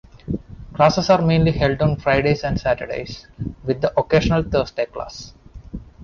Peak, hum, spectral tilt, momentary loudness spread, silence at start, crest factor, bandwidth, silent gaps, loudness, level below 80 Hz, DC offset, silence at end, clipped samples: -4 dBFS; none; -6.5 dB/octave; 18 LU; 0.25 s; 16 dB; 7.2 kHz; none; -19 LUFS; -36 dBFS; under 0.1%; 0 s; under 0.1%